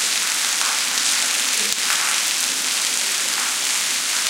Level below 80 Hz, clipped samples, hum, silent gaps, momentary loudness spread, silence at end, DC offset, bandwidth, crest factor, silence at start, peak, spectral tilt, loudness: -78 dBFS; under 0.1%; none; none; 2 LU; 0 s; under 0.1%; 17 kHz; 20 dB; 0 s; 0 dBFS; 3 dB/octave; -18 LUFS